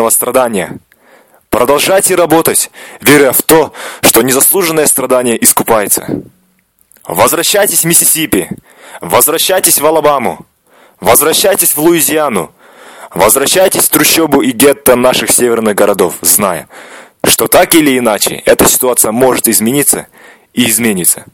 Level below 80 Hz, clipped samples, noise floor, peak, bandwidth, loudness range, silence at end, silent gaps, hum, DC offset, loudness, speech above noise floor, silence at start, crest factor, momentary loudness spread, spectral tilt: -42 dBFS; 1%; -53 dBFS; 0 dBFS; over 20 kHz; 2 LU; 0.1 s; none; none; under 0.1%; -8 LUFS; 44 dB; 0 s; 10 dB; 9 LU; -2.5 dB/octave